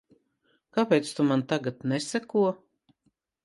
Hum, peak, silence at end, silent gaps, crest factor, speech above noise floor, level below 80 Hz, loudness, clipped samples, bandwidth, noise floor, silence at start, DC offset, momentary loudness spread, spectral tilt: none; -10 dBFS; 0.9 s; none; 20 dB; 47 dB; -74 dBFS; -27 LUFS; under 0.1%; 11.5 kHz; -73 dBFS; 0.75 s; under 0.1%; 6 LU; -5.5 dB/octave